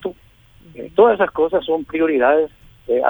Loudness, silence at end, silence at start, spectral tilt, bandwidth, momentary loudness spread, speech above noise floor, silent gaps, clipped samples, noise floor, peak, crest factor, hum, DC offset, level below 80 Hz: -17 LUFS; 0 s; 0 s; -7.5 dB/octave; over 20 kHz; 12 LU; 34 dB; none; under 0.1%; -49 dBFS; -2 dBFS; 16 dB; none; under 0.1%; -50 dBFS